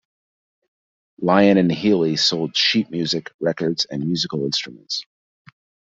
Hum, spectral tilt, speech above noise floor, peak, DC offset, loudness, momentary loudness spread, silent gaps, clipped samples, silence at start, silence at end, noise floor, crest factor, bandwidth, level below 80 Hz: none; -5 dB/octave; over 70 dB; -2 dBFS; under 0.1%; -20 LUFS; 10 LU; 3.34-3.39 s; under 0.1%; 1.2 s; 0.85 s; under -90 dBFS; 20 dB; 7.8 kHz; -62 dBFS